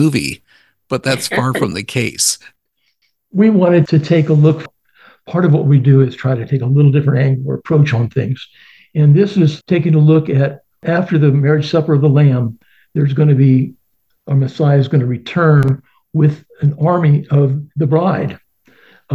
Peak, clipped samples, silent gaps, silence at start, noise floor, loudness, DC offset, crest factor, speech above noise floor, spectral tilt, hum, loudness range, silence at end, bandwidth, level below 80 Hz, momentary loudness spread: 0 dBFS; under 0.1%; none; 0 s; -64 dBFS; -14 LUFS; 0.1%; 14 dB; 52 dB; -6.5 dB/octave; none; 2 LU; 0 s; 12.5 kHz; -50 dBFS; 10 LU